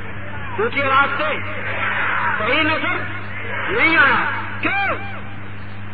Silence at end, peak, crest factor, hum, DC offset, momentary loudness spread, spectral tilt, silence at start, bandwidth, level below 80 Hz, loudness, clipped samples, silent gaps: 0 s; -4 dBFS; 18 dB; none; 4%; 16 LU; -8 dB/octave; 0 s; 4.9 kHz; -46 dBFS; -18 LUFS; under 0.1%; none